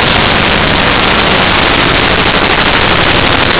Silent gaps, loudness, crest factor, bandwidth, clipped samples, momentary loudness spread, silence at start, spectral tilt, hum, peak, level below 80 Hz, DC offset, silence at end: none; -7 LUFS; 8 dB; 4 kHz; under 0.1%; 1 LU; 0 s; -8.5 dB/octave; none; 0 dBFS; -22 dBFS; 3%; 0 s